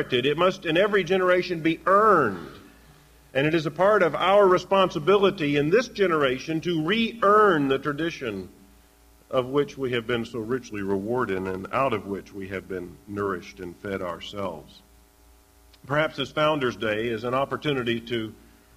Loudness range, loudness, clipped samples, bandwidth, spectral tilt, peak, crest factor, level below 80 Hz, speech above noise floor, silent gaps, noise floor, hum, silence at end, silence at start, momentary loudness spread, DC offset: 10 LU; -24 LUFS; under 0.1%; 15.5 kHz; -6 dB/octave; -8 dBFS; 16 dB; -56 dBFS; 32 dB; none; -56 dBFS; none; 0.45 s; 0 s; 15 LU; under 0.1%